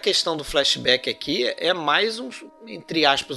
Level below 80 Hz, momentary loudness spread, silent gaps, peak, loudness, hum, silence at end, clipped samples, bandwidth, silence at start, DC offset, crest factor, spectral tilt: -50 dBFS; 17 LU; none; -2 dBFS; -21 LUFS; none; 0 s; under 0.1%; 12.5 kHz; 0 s; under 0.1%; 22 dB; -2.5 dB/octave